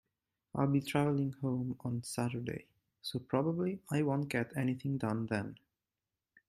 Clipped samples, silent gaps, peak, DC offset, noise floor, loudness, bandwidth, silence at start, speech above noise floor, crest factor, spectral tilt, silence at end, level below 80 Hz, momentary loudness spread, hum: under 0.1%; none; -18 dBFS; under 0.1%; under -90 dBFS; -36 LUFS; 13 kHz; 0.55 s; over 55 dB; 18 dB; -6.5 dB/octave; 0.95 s; -70 dBFS; 9 LU; none